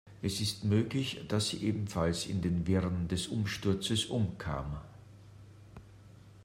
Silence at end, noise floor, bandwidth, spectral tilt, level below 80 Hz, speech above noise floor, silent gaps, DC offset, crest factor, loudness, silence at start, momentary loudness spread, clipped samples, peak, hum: 0 s; -55 dBFS; 16 kHz; -5.5 dB/octave; -54 dBFS; 22 dB; none; under 0.1%; 16 dB; -33 LUFS; 0.05 s; 14 LU; under 0.1%; -18 dBFS; none